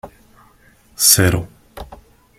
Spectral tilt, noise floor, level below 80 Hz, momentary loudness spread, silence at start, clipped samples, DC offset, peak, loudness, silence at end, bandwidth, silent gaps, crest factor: -2.5 dB/octave; -51 dBFS; -42 dBFS; 26 LU; 0.05 s; under 0.1%; under 0.1%; 0 dBFS; -13 LUFS; 0.45 s; 17 kHz; none; 20 dB